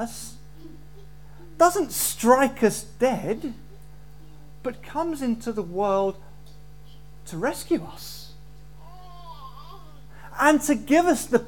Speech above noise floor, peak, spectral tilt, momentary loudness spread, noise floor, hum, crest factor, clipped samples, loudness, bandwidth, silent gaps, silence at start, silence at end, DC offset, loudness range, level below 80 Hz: 24 dB; -4 dBFS; -4 dB/octave; 25 LU; -47 dBFS; none; 22 dB; under 0.1%; -23 LUFS; 19 kHz; none; 0 s; 0 s; 0.8%; 10 LU; -50 dBFS